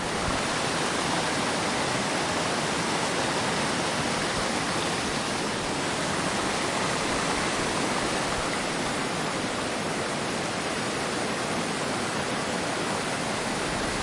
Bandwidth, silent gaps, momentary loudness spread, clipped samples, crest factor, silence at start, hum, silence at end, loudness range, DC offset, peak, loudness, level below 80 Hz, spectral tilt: 11.5 kHz; none; 2 LU; under 0.1%; 14 dB; 0 s; none; 0 s; 2 LU; under 0.1%; -14 dBFS; -27 LUFS; -50 dBFS; -3 dB/octave